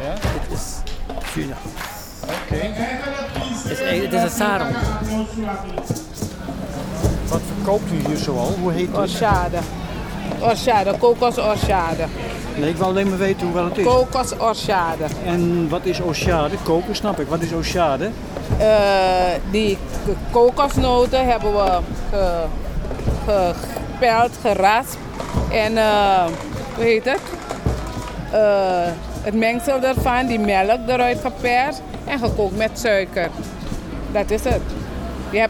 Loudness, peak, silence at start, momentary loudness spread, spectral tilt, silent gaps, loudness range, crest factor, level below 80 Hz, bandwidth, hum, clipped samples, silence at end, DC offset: -20 LUFS; -2 dBFS; 0 s; 12 LU; -5.5 dB/octave; none; 5 LU; 16 dB; -30 dBFS; over 20 kHz; none; under 0.1%; 0 s; under 0.1%